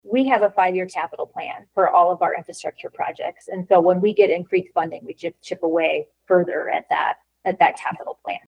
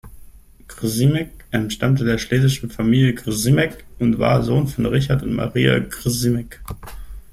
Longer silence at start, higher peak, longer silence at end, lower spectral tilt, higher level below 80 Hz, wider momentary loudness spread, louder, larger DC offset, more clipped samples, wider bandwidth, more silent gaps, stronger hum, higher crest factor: about the same, 0.05 s vs 0.05 s; about the same, -2 dBFS vs -2 dBFS; about the same, 0.1 s vs 0.1 s; about the same, -6 dB/octave vs -6 dB/octave; second, -72 dBFS vs -38 dBFS; first, 14 LU vs 10 LU; about the same, -21 LUFS vs -19 LUFS; neither; neither; second, 11 kHz vs 15.5 kHz; neither; neither; about the same, 18 dB vs 18 dB